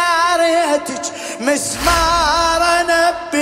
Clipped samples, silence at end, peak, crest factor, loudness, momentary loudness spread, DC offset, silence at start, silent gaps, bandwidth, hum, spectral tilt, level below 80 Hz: under 0.1%; 0 s; -2 dBFS; 14 dB; -15 LUFS; 8 LU; under 0.1%; 0 s; none; 16 kHz; none; -2.5 dB/octave; -34 dBFS